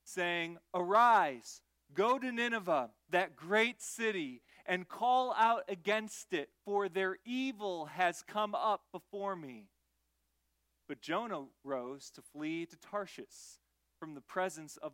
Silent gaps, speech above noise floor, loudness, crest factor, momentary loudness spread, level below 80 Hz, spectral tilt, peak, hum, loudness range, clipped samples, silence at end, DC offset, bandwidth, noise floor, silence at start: none; 45 dB; -35 LUFS; 20 dB; 17 LU; -84 dBFS; -3.5 dB/octave; -16 dBFS; none; 11 LU; under 0.1%; 0.05 s; under 0.1%; 16.5 kHz; -81 dBFS; 0.05 s